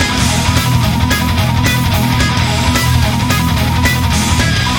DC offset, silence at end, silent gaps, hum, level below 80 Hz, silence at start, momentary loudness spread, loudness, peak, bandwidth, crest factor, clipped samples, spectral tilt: under 0.1%; 0 s; none; none; -22 dBFS; 0 s; 1 LU; -12 LUFS; 0 dBFS; over 20 kHz; 12 dB; under 0.1%; -4.5 dB/octave